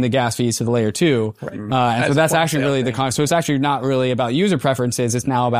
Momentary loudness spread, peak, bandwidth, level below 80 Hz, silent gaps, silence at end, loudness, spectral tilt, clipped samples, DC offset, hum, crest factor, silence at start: 4 LU; -4 dBFS; 15.5 kHz; -54 dBFS; none; 0 s; -18 LUFS; -5 dB/octave; under 0.1%; 0.2%; none; 14 dB; 0 s